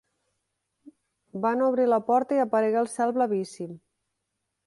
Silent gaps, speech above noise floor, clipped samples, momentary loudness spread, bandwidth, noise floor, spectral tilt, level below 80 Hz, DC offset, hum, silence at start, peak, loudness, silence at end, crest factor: none; 57 dB; under 0.1%; 15 LU; 11.5 kHz; -81 dBFS; -6 dB/octave; -76 dBFS; under 0.1%; none; 1.35 s; -10 dBFS; -25 LUFS; 0.9 s; 16 dB